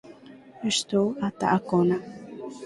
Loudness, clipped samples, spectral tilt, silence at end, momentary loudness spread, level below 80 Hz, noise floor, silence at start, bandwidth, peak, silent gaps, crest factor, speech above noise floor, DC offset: -25 LUFS; under 0.1%; -5 dB/octave; 0 s; 16 LU; -64 dBFS; -48 dBFS; 0.05 s; 11.5 kHz; -8 dBFS; none; 18 dB; 24 dB; under 0.1%